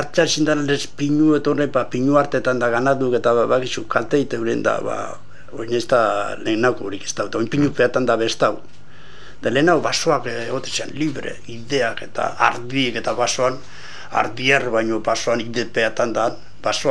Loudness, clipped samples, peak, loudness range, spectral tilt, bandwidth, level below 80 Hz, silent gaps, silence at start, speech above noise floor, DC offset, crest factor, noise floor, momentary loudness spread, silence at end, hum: -20 LUFS; under 0.1%; 0 dBFS; 3 LU; -4.5 dB/octave; 12 kHz; -54 dBFS; none; 0 s; 24 dB; 3%; 20 dB; -44 dBFS; 10 LU; 0 s; none